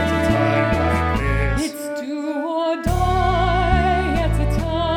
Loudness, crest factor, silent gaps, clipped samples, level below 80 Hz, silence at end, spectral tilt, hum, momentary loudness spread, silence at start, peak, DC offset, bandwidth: -20 LUFS; 14 dB; none; under 0.1%; -26 dBFS; 0 s; -6.5 dB/octave; none; 7 LU; 0 s; -4 dBFS; under 0.1%; 17.5 kHz